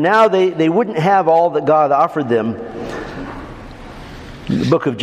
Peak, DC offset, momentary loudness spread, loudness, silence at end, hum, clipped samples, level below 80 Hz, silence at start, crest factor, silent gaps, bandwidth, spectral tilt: 0 dBFS; under 0.1%; 22 LU; -15 LUFS; 0 s; none; under 0.1%; -42 dBFS; 0 s; 16 dB; none; 12.5 kHz; -7 dB/octave